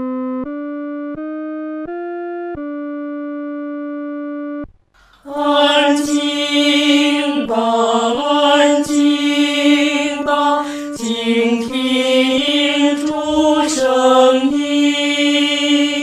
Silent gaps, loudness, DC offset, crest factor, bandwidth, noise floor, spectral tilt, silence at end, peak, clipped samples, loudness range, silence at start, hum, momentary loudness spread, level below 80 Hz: none; -15 LUFS; under 0.1%; 16 dB; 13.5 kHz; -51 dBFS; -2.5 dB/octave; 0 s; 0 dBFS; under 0.1%; 11 LU; 0 s; none; 13 LU; -52 dBFS